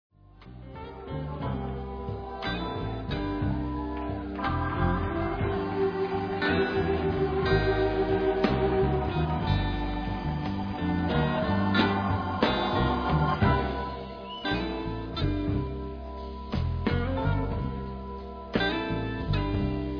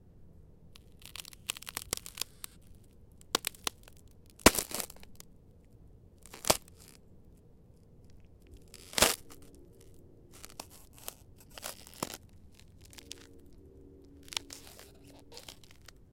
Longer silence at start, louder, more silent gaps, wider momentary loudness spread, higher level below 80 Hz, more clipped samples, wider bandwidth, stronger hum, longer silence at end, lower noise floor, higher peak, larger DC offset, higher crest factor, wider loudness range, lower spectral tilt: first, 0.4 s vs 0.2 s; first, -29 LUFS vs -33 LUFS; neither; second, 11 LU vs 29 LU; first, -38 dBFS vs -54 dBFS; neither; second, 5.4 kHz vs 17 kHz; neither; second, 0 s vs 0.6 s; second, -48 dBFS vs -58 dBFS; second, -8 dBFS vs -4 dBFS; neither; second, 20 dB vs 36 dB; second, 6 LU vs 14 LU; first, -8.5 dB/octave vs -2 dB/octave